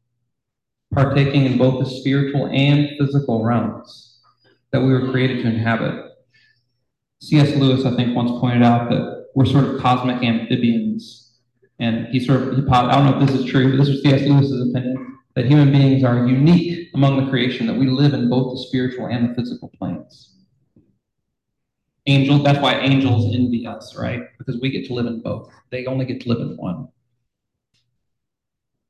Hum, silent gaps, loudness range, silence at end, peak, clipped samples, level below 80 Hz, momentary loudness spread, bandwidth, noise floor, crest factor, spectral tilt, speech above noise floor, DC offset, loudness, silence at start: none; none; 9 LU; 2.05 s; -2 dBFS; under 0.1%; -48 dBFS; 13 LU; 8.4 kHz; -83 dBFS; 16 dB; -8 dB/octave; 66 dB; under 0.1%; -18 LUFS; 0.9 s